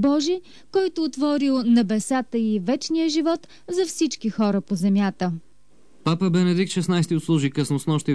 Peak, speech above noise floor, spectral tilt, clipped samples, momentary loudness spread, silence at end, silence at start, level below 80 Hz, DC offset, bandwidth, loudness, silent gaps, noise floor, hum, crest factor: -10 dBFS; 38 dB; -6 dB/octave; under 0.1%; 7 LU; 0 s; 0 s; -64 dBFS; 0.5%; 11 kHz; -23 LUFS; none; -59 dBFS; none; 12 dB